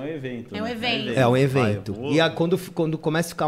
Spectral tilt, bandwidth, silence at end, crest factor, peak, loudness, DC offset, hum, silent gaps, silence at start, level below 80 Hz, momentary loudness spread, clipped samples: -6 dB/octave; 16 kHz; 0 s; 16 dB; -8 dBFS; -23 LUFS; under 0.1%; none; none; 0 s; -56 dBFS; 11 LU; under 0.1%